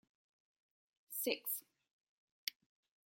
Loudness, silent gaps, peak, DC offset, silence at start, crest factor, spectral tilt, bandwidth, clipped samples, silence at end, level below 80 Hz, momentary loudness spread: -42 LUFS; 1.91-2.47 s; -16 dBFS; under 0.1%; 1.1 s; 32 dB; -0.5 dB/octave; 17 kHz; under 0.1%; 0.6 s; under -90 dBFS; 8 LU